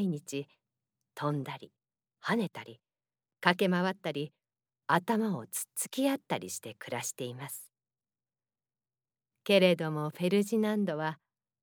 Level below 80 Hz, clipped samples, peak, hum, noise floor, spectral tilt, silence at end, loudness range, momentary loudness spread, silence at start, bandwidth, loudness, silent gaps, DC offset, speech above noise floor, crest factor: under -90 dBFS; under 0.1%; -8 dBFS; none; under -90 dBFS; -4.5 dB/octave; 0.45 s; 7 LU; 16 LU; 0 s; over 20 kHz; -32 LUFS; none; under 0.1%; over 59 dB; 26 dB